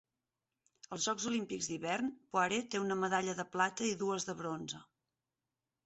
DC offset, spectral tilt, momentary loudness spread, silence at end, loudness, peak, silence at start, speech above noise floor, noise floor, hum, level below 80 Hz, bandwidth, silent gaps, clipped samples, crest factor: under 0.1%; -3 dB/octave; 7 LU; 1.05 s; -36 LUFS; -18 dBFS; 0.9 s; over 54 dB; under -90 dBFS; none; -76 dBFS; 8 kHz; none; under 0.1%; 20 dB